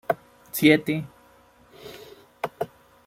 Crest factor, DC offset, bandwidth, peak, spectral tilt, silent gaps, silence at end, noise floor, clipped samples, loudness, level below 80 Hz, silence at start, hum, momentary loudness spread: 24 dB; under 0.1%; 16.5 kHz; -4 dBFS; -5 dB/octave; none; 0.4 s; -56 dBFS; under 0.1%; -24 LUFS; -64 dBFS; 0.1 s; none; 25 LU